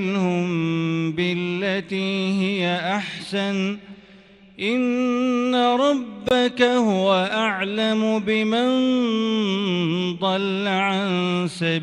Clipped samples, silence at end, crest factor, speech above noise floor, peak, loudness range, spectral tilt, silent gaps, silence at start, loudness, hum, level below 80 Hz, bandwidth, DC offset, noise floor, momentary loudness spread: under 0.1%; 0 s; 18 dB; 27 dB; -4 dBFS; 4 LU; -6 dB/octave; none; 0 s; -21 LUFS; none; -62 dBFS; 11 kHz; under 0.1%; -48 dBFS; 6 LU